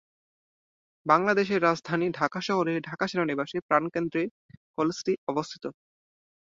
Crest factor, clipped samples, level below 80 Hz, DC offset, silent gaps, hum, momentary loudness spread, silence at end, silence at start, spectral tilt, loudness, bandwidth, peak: 22 dB; under 0.1%; -70 dBFS; under 0.1%; 3.62-3.69 s, 4.31-4.49 s, 4.57-4.74 s, 5.18-5.27 s; none; 12 LU; 0.75 s; 1.05 s; -5.5 dB/octave; -27 LUFS; 7.8 kHz; -6 dBFS